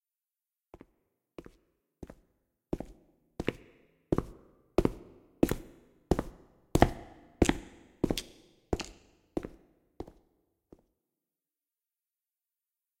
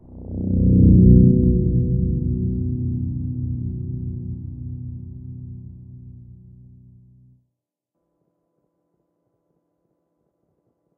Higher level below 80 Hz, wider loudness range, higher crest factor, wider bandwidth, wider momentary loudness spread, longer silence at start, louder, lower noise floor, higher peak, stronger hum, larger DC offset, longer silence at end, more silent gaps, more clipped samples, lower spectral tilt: second, -46 dBFS vs -30 dBFS; second, 17 LU vs 23 LU; first, 30 dB vs 20 dB; first, 16.5 kHz vs 0.9 kHz; about the same, 23 LU vs 24 LU; first, 2 s vs 0.1 s; second, -34 LUFS vs -19 LUFS; first, under -90 dBFS vs -80 dBFS; second, -6 dBFS vs -2 dBFS; neither; neither; second, 2.95 s vs 4.75 s; neither; neither; second, -6 dB/octave vs -21.5 dB/octave